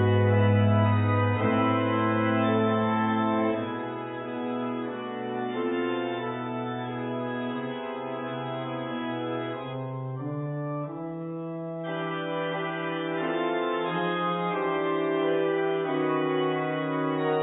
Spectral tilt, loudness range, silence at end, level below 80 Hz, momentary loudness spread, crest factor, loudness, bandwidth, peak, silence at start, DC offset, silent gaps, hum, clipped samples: -11.5 dB/octave; 8 LU; 0 s; -56 dBFS; 10 LU; 16 dB; -28 LUFS; 4 kHz; -12 dBFS; 0 s; under 0.1%; none; none; under 0.1%